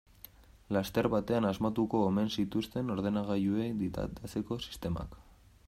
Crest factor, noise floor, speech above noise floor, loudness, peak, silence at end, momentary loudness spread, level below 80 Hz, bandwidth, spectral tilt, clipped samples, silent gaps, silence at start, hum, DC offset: 18 dB; -56 dBFS; 23 dB; -33 LUFS; -16 dBFS; 0.45 s; 9 LU; -54 dBFS; 16 kHz; -7 dB/octave; under 0.1%; none; 0.7 s; none; under 0.1%